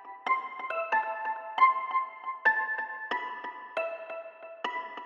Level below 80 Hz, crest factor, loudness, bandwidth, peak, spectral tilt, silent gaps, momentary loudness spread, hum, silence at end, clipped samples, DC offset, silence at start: under -90 dBFS; 22 dB; -30 LUFS; 7 kHz; -10 dBFS; -2 dB/octave; none; 14 LU; none; 0 s; under 0.1%; under 0.1%; 0 s